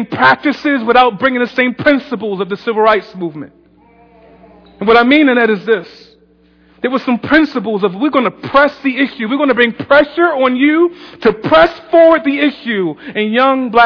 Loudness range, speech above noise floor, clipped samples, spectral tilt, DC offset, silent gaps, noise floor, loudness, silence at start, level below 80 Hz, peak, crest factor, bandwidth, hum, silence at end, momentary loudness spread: 4 LU; 37 dB; 0.3%; -7 dB/octave; under 0.1%; none; -49 dBFS; -12 LUFS; 0 s; -48 dBFS; 0 dBFS; 12 dB; 5.4 kHz; none; 0 s; 9 LU